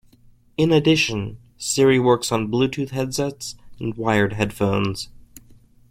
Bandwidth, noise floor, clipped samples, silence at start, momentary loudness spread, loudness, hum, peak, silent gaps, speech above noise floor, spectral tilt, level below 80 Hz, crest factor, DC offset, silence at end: 16.5 kHz; -52 dBFS; under 0.1%; 0.6 s; 16 LU; -21 LUFS; none; -4 dBFS; none; 32 dB; -5 dB/octave; -48 dBFS; 18 dB; under 0.1%; 0.5 s